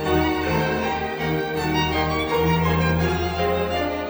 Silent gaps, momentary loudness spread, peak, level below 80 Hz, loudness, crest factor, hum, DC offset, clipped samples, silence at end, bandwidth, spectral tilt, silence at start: none; 4 LU; -8 dBFS; -36 dBFS; -22 LUFS; 14 dB; none; under 0.1%; under 0.1%; 0 s; over 20 kHz; -6 dB/octave; 0 s